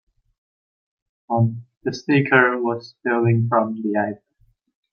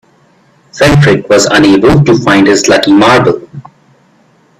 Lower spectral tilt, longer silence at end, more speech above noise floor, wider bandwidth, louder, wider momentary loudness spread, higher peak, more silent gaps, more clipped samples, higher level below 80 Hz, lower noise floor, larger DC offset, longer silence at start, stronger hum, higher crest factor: first, -7.5 dB/octave vs -5 dB/octave; second, 0.75 s vs 1 s; about the same, 43 dB vs 41 dB; second, 6.8 kHz vs 14 kHz; second, -20 LUFS vs -6 LUFS; first, 12 LU vs 3 LU; about the same, -2 dBFS vs 0 dBFS; first, 1.77-1.81 s vs none; second, under 0.1% vs 0.2%; second, -66 dBFS vs -34 dBFS; first, -62 dBFS vs -47 dBFS; neither; first, 1.3 s vs 0.75 s; neither; first, 20 dB vs 8 dB